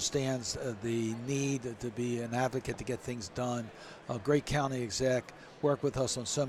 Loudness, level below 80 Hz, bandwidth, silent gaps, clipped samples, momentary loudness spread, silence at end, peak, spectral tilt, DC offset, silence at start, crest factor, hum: -34 LUFS; -56 dBFS; 14.5 kHz; none; under 0.1%; 8 LU; 0 s; -16 dBFS; -4.5 dB/octave; under 0.1%; 0 s; 18 dB; none